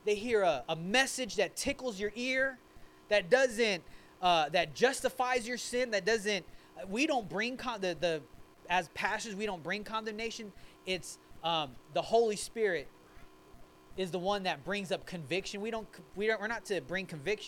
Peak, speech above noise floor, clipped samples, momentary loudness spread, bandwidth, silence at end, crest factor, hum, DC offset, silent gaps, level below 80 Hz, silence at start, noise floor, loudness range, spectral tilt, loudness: -12 dBFS; 22 dB; under 0.1%; 10 LU; 18 kHz; 0 s; 22 dB; none; under 0.1%; none; -60 dBFS; 0.05 s; -55 dBFS; 6 LU; -3 dB/octave; -33 LUFS